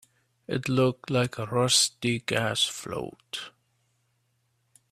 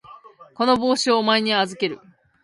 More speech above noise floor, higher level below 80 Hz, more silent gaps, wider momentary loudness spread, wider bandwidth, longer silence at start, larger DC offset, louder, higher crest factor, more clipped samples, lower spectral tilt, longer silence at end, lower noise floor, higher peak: first, 46 dB vs 26 dB; about the same, -64 dBFS vs -62 dBFS; neither; first, 16 LU vs 9 LU; first, 15.5 kHz vs 11.5 kHz; first, 0.5 s vs 0.1 s; neither; second, -26 LUFS vs -20 LUFS; first, 22 dB vs 16 dB; neither; about the same, -3.5 dB/octave vs -3.5 dB/octave; first, 1.45 s vs 0.45 s; first, -73 dBFS vs -45 dBFS; about the same, -8 dBFS vs -6 dBFS